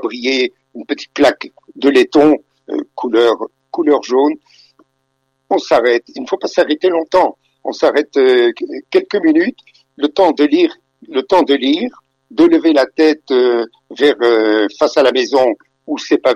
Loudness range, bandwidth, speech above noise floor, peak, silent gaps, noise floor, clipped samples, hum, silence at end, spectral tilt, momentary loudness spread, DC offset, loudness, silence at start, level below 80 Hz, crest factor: 3 LU; 9.8 kHz; 54 dB; -2 dBFS; none; -66 dBFS; under 0.1%; none; 0 s; -4 dB/octave; 13 LU; under 0.1%; -14 LUFS; 0 s; -58 dBFS; 12 dB